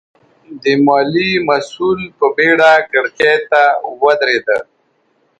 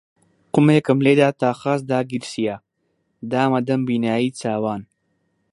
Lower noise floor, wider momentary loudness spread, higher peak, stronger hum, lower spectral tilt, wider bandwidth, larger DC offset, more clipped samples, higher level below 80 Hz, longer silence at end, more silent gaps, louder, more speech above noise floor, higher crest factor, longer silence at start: second, -59 dBFS vs -70 dBFS; second, 8 LU vs 11 LU; about the same, 0 dBFS vs 0 dBFS; neither; second, -5 dB/octave vs -7 dB/octave; second, 9.2 kHz vs 11.5 kHz; neither; neither; first, -56 dBFS vs -64 dBFS; about the same, 0.75 s vs 0.7 s; neither; first, -13 LUFS vs -20 LUFS; second, 47 dB vs 51 dB; second, 14 dB vs 20 dB; about the same, 0.5 s vs 0.55 s